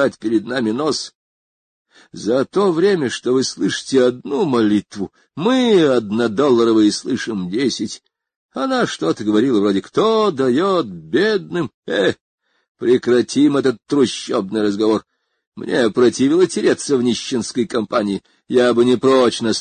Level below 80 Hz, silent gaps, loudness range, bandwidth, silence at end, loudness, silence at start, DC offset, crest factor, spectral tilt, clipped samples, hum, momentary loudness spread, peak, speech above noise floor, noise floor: -58 dBFS; 1.15-1.85 s, 8.36-8.49 s, 11.74-11.83 s, 12.21-12.38 s, 12.69-12.75 s, 15.47-15.52 s; 2 LU; 9.6 kHz; 0 s; -17 LUFS; 0 s; under 0.1%; 14 dB; -5 dB/octave; under 0.1%; none; 9 LU; -2 dBFS; over 73 dB; under -90 dBFS